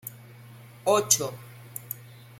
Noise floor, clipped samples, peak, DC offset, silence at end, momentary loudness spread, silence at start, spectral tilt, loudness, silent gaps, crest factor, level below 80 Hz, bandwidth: -48 dBFS; under 0.1%; -4 dBFS; under 0.1%; 0.2 s; 20 LU; 0.05 s; -2 dB/octave; -25 LUFS; none; 26 dB; -70 dBFS; 16.5 kHz